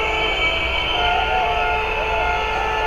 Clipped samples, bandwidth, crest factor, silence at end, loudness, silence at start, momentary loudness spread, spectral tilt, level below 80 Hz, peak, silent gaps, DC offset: under 0.1%; 15 kHz; 12 dB; 0 s; -19 LUFS; 0 s; 2 LU; -3.5 dB/octave; -30 dBFS; -8 dBFS; none; under 0.1%